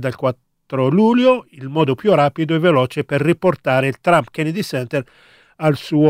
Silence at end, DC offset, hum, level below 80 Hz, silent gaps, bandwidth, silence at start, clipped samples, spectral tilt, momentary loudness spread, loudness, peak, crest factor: 0 s; under 0.1%; none; -58 dBFS; none; 16 kHz; 0 s; under 0.1%; -7 dB/octave; 8 LU; -17 LUFS; 0 dBFS; 16 dB